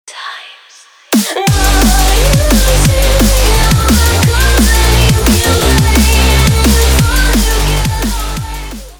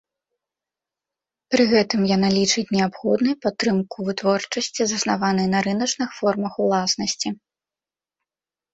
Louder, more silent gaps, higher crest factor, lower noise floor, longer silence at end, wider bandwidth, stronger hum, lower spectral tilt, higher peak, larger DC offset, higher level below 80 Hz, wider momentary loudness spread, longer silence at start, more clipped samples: first, -10 LUFS vs -21 LUFS; neither; second, 10 dB vs 18 dB; second, -41 dBFS vs under -90 dBFS; second, 0.05 s vs 1.4 s; first, over 20 kHz vs 8.2 kHz; neither; about the same, -4 dB/octave vs -4 dB/octave; first, 0 dBFS vs -4 dBFS; neither; first, -12 dBFS vs -60 dBFS; first, 9 LU vs 6 LU; second, 0.05 s vs 1.5 s; neither